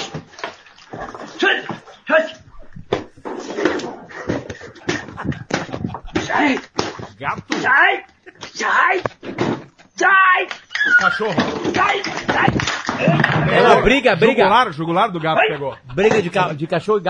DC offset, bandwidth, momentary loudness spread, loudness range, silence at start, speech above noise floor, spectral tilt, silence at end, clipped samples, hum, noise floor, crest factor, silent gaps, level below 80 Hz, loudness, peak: under 0.1%; 10 kHz; 18 LU; 9 LU; 0 s; 21 dB; -5 dB/octave; 0 s; under 0.1%; none; -37 dBFS; 18 dB; none; -44 dBFS; -17 LUFS; 0 dBFS